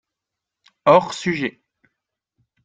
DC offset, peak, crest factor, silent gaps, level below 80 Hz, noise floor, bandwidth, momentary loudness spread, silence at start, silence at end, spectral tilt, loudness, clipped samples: under 0.1%; -2 dBFS; 22 dB; none; -64 dBFS; -84 dBFS; 9.4 kHz; 10 LU; 0.85 s; 1.15 s; -5.5 dB/octave; -19 LUFS; under 0.1%